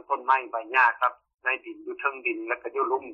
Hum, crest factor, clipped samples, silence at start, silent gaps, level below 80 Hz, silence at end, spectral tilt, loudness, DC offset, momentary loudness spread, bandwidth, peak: none; 20 dB; under 0.1%; 0.1 s; 1.34-1.38 s; -78 dBFS; 0 s; -3.5 dB/octave; -26 LUFS; under 0.1%; 9 LU; 15 kHz; -8 dBFS